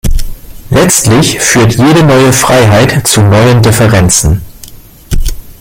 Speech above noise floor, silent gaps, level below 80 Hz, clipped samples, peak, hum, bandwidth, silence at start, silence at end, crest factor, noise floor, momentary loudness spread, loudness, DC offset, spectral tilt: 25 dB; none; -18 dBFS; 0.4%; 0 dBFS; none; over 20 kHz; 0.05 s; 0.1 s; 6 dB; -30 dBFS; 12 LU; -6 LUFS; under 0.1%; -4.5 dB/octave